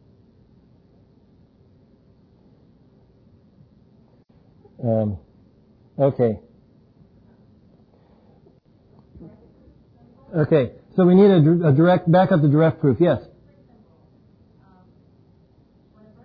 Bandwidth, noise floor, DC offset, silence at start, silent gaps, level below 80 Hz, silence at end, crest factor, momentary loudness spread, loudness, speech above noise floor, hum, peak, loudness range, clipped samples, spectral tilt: 5 kHz; -55 dBFS; under 0.1%; 4.8 s; none; -58 dBFS; 3.05 s; 18 dB; 15 LU; -18 LUFS; 39 dB; none; -4 dBFS; 14 LU; under 0.1%; -11.5 dB/octave